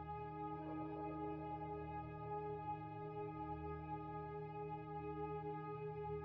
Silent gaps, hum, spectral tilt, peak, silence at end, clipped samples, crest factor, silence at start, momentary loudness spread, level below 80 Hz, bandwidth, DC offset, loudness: none; none; -7.5 dB/octave; -36 dBFS; 0 s; under 0.1%; 12 dB; 0 s; 2 LU; -64 dBFS; 5.4 kHz; under 0.1%; -48 LUFS